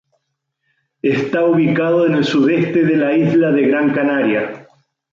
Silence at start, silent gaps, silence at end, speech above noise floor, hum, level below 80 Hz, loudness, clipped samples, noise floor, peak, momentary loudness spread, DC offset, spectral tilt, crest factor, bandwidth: 1.05 s; none; 0.5 s; 58 dB; none; -60 dBFS; -15 LUFS; under 0.1%; -73 dBFS; -4 dBFS; 5 LU; under 0.1%; -7.5 dB/octave; 12 dB; 7.4 kHz